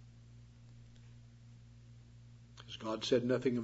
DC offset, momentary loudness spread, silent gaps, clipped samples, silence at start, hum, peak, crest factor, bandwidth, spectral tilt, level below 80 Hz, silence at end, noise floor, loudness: under 0.1%; 25 LU; none; under 0.1%; 0 s; 60 Hz at -70 dBFS; -18 dBFS; 22 dB; 7.6 kHz; -5 dB/octave; -66 dBFS; 0 s; -57 dBFS; -36 LUFS